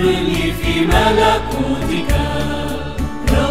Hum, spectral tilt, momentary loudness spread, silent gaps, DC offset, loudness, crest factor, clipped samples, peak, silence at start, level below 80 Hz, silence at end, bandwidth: none; -5.5 dB/octave; 9 LU; none; 3%; -17 LUFS; 16 dB; under 0.1%; 0 dBFS; 0 s; -22 dBFS; 0 s; 16 kHz